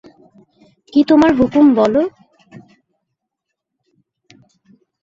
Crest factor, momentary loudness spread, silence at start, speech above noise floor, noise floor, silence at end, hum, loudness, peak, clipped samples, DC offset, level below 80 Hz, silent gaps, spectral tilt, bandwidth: 16 dB; 7 LU; 0.95 s; 67 dB; -78 dBFS; 2.95 s; none; -13 LUFS; -2 dBFS; under 0.1%; under 0.1%; -50 dBFS; none; -7 dB/octave; 7.4 kHz